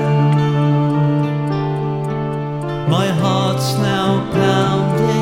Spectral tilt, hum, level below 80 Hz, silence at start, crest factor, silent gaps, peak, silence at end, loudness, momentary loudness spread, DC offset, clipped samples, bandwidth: -7 dB/octave; none; -46 dBFS; 0 s; 14 dB; none; -2 dBFS; 0 s; -17 LUFS; 6 LU; under 0.1%; under 0.1%; 15.5 kHz